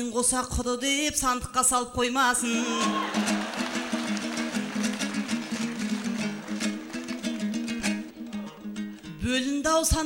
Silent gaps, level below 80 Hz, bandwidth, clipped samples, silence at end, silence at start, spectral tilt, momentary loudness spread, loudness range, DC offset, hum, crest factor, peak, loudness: none; -44 dBFS; 16 kHz; under 0.1%; 0 s; 0 s; -3 dB/octave; 12 LU; 6 LU; under 0.1%; none; 18 dB; -10 dBFS; -27 LUFS